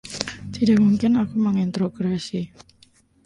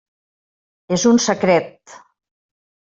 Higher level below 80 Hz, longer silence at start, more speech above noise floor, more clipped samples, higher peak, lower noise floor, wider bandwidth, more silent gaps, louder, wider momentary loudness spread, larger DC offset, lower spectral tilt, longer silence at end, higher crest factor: first, -52 dBFS vs -60 dBFS; second, 0.05 s vs 0.9 s; second, 36 dB vs over 73 dB; neither; about the same, 0 dBFS vs -2 dBFS; second, -57 dBFS vs under -90 dBFS; first, 11.5 kHz vs 7.8 kHz; neither; second, -22 LUFS vs -16 LUFS; first, 13 LU vs 9 LU; neither; first, -6.5 dB/octave vs -4.5 dB/octave; second, 0.8 s vs 1 s; about the same, 22 dB vs 18 dB